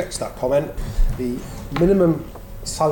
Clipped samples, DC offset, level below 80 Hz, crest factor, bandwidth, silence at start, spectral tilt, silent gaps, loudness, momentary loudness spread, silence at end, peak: under 0.1%; under 0.1%; -26 dBFS; 14 dB; 17 kHz; 0 s; -6 dB/octave; none; -22 LUFS; 14 LU; 0 s; -8 dBFS